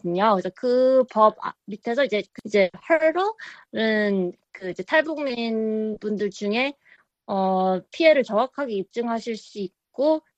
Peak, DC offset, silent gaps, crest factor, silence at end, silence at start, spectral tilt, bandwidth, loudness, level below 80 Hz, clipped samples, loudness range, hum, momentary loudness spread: -4 dBFS; under 0.1%; none; 20 dB; 0.2 s; 0.05 s; -6 dB/octave; 8.4 kHz; -23 LUFS; -68 dBFS; under 0.1%; 3 LU; none; 15 LU